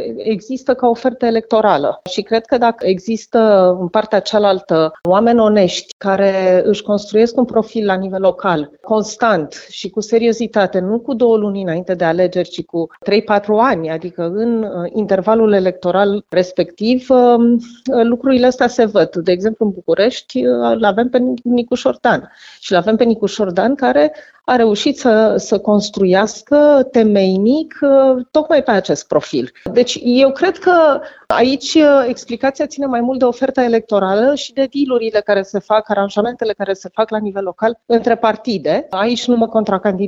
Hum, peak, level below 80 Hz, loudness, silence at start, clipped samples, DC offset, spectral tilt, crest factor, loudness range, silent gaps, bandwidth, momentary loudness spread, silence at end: none; 0 dBFS; -54 dBFS; -14 LUFS; 0 s; under 0.1%; under 0.1%; -5.5 dB/octave; 12 dB; 4 LU; 5.92-6.00 s; 8 kHz; 8 LU; 0 s